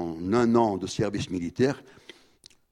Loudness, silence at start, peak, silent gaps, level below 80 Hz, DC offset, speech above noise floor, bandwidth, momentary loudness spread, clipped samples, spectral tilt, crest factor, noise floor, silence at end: -26 LUFS; 0 s; -8 dBFS; none; -56 dBFS; under 0.1%; 32 dB; 11 kHz; 9 LU; under 0.1%; -6 dB/octave; 20 dB; -57 dBFS; 0.9 s